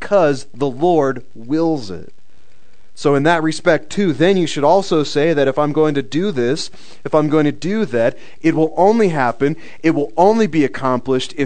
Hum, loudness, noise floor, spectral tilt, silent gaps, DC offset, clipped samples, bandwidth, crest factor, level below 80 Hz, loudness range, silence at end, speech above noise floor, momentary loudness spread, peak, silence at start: none; -16 LUFS; -55 dBFS; -6 dB/octave; none; 4%; under 0.1%; 9.4 kHz; 16 dB; -50 dBFS; 3 LU; 0 s; 39 dB; 7 LU; 0 dBFS; 0 s